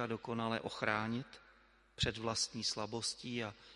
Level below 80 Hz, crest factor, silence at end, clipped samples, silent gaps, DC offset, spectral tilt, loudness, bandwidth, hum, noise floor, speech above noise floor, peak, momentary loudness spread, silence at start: -60 dBFS; 24 dB; 0 s; under 0.1%; none; under 0.1%; -3.5 dB/octave; -38 LUFS; 11.5 kHz; none; -67 dBFS; 27 dB; -16 dBFS; 7 LU; 0 s